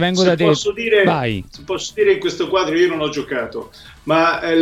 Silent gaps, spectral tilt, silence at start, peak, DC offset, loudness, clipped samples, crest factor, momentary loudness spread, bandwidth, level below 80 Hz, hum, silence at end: none; -5 dB/octave; 0 s; 0 dBFS; under 0.1%; -17 LUFS; under 0.1%; 16 dB; 13 LU; 13 kHz; -48 dBFS; none; 0 s